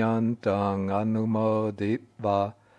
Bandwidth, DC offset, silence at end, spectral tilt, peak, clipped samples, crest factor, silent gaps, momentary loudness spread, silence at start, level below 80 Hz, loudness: 8.6 kHz; under 0.1%; 0.25 s; -9 dB/octave; -10 dBFS; under 0.1%; 16 dB; none; 4 LU; 0 s; -72 dBFS; -27 LUFS